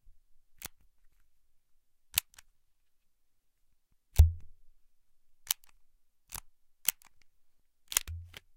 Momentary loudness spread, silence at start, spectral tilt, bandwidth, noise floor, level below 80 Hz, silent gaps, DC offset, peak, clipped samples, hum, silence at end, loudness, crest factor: 20 LU; 2.15 s; -2 dB/octave; 17 kHz; -70 dBFS; -40 dBFS; none; under 0.1%; -2 dBFS; under 0.1%; none; 0.35 s; -32 LUFS; 36 dB